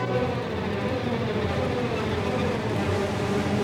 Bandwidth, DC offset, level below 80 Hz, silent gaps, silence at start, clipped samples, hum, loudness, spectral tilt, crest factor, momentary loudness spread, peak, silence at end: 16.5 kHz; under 0.1%; -50 dBFS; none; 0 s; under 0.1%; none; -27 LUFS; -6.5 dB/octave; 12 dB; 2 LU; -14 dBFS; 0 s